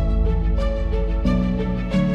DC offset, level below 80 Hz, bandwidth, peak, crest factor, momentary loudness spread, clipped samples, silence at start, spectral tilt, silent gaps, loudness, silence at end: under 0.1%; -22 dBFS; 6.4 kHz; -8 dBFS; 10 dB; 3 LU; under 0.1%; 0 s; -8.5 dB/octave; none; -22 LUFS; 0 s